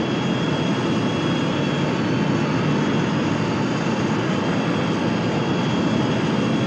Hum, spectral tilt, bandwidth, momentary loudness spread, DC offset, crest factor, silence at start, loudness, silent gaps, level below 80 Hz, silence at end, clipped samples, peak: none; -6.5 dB/octave; 9.2 kHz; 1 LU; under 0.1%; 12 dB; 0 s; -21 LUFS; none; -50 dBFS; 0 s; under 0.1%; -8 dBFS